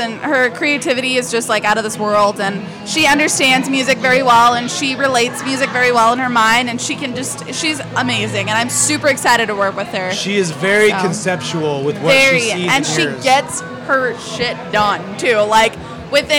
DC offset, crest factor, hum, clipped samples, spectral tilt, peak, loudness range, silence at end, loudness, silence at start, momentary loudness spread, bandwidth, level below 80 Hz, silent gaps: under 0.1%; 12 dB; none; under 0.1%; -3 dB/octave; -4 dBFS; 3 LU; 0 s; -14 LUFS; 0 s; 8 LU; 18 kHz; -50 dBFS; none